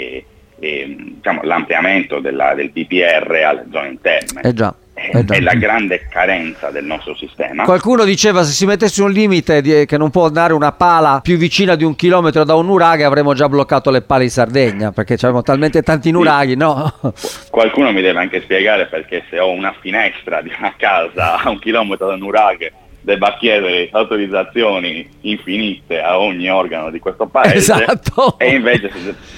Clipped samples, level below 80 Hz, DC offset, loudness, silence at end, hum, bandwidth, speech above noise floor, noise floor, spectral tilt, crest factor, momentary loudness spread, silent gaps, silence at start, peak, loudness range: under 0.1%; -42 dBFS; under 0.1%; -13 LUFS; 0 s; none; 16.5 kHz; 20 dB; -33 dBFS; -5 dB/octave; 14 dB; 11 LU; none; 0 s; 0 dBFS; 4 LU